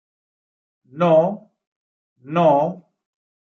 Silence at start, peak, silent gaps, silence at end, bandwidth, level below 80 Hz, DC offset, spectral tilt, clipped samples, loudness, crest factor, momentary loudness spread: 0.95 s; -4 dBFS; 1.67-2.16 s; 0.8 s; 6.8 kHz; -70 dBFS; under 0.1%; -9 dB/octave; under 0.1%; -18 LUFS; 18 dB; 16 LU